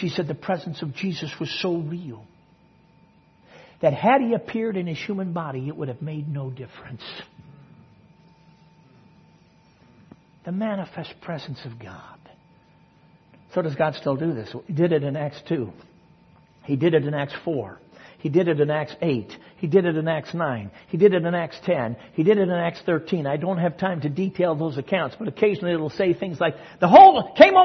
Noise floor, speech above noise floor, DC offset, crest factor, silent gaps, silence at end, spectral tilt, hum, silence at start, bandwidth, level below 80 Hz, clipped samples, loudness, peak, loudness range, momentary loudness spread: -56 dBFS; 35 dB; under 0.1%; 22 dB; none; 0 s; -7.5 dB/octave; none; 0 s; 6.4 kHz; -64 dBFS; under 0.1%; -22 LUFS; 0 dBFS; 12 LU; 16 LU